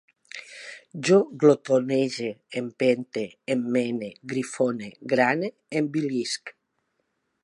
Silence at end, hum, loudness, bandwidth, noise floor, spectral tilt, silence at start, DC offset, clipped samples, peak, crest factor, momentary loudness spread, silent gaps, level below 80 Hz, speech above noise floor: 0.9 s; none; -25 LUFS; 11.5 kHz; -75 dBFS; -5.5 dB/octave; 0.35 s; under 0.1%; under 0.1%; -4 dBFS; 20 dB; 18 LU; none; -76 dBFS; 51 dB